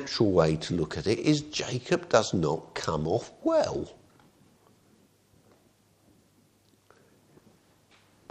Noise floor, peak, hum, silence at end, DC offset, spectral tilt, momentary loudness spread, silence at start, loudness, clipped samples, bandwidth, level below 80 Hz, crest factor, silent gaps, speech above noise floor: -64 dBFS; -4 dBFS; none; 4.4 s; under 0.1%; -5.5 dB/octave; 8 LU; 0 s; -28 LUFS; under 0.1%; 10 kHz; -56 dBFS; 26 dB; none; 37 dB